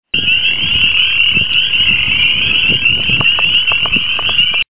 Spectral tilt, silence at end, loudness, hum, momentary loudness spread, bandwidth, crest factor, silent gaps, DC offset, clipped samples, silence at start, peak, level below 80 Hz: -7 dB/octave; 0.05 s; -9 LUFS; none; 2 LU; 4 kHz; 12 dB; none; 6%; under 0.1%; 0 s; 0 dBFS; -36 dBFS